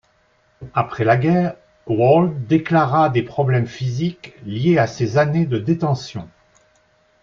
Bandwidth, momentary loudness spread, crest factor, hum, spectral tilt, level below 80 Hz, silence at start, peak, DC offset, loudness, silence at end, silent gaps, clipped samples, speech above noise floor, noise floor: 7.2 kHz; 10 LU; 16 dB; none; -8 dB/octave; -54 dBFS; 0.6 s; -2 dBFS; under 0.1%; -18 LUFS; 0.95 s; none; under 0.1%; 42 dB; -60 dBFS